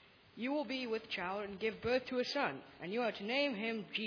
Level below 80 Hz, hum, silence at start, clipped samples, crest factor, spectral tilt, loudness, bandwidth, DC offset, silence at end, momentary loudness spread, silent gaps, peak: -70 dBFS; none; 0.35 s; under 0.1%; 18 dB; -5 dB/octave; -38 LUFS; 5.4 kHz; under 0.1%; 0 s; 5 LU; none; -20 dBFS